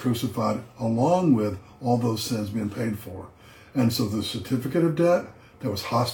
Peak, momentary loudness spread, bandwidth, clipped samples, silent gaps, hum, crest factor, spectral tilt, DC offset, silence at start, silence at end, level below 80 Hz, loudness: -8 dBFS; 12 LU; 19 kHz; under 0.1%; none; none; 16 dB; -6.5 dB/octave; under 0.1%; 0 s; 0 s; -58 dBFS; -25 LUFS